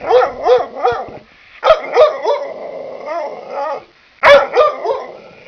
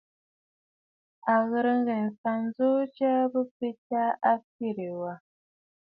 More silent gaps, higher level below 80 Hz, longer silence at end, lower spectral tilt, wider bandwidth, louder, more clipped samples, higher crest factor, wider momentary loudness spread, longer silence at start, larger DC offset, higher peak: second, none vs 2.18-2.24 s, 3.51-3.60 s, 3.78-3.90 s, 4.44-4.59 s; first, -48 dBFS vs -80 dBFS; second, 0.2 s vs 0.65 s; second, -3.5 dB/octave vs -10 dB/octave; first, 5.4 kHz vs 4.8 kHz; first, -14 LUFS vs -28 LUFS; first, 0.2% vs under 0.1%; about the same, 14 dB vs 18 dB; first, 19 LU vs 10 LU; second, 0 s vs 1.25 s; neither; first, 0 dBFS vs -10 dBFS